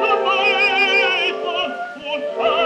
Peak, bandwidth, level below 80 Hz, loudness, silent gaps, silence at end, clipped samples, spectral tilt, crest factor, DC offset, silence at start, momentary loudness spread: -4 dBFS; 11 kHz; -62 dBFS; -17 LUFS; none; 0 s; under 0.1%; -2 dB/octave; 14 dB; under 0.1%; 0 s; 11 LU